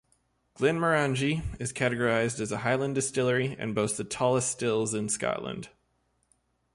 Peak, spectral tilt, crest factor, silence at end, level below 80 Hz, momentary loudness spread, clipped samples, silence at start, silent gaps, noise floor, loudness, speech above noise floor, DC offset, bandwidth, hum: -12 dBFS; -4.5 dB/octave; 18 dB; 1.05 s; -54 dBFS; 6 LU; under 0.1%; 0.6 s; none; -73 dBFS; -28 LUFS; 45 dB; under 0.1%; 11.5 kHz; none